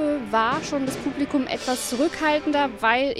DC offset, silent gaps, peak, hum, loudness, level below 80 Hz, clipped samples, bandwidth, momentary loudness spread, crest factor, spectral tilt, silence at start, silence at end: under 0.1%; none; -6 dBFS; none; -23 LUFS; -52 dBFS; under 0.1%; 15 kHz; 5 LU; 18 dB; -3.5 dB/octave; 0 s; 0 s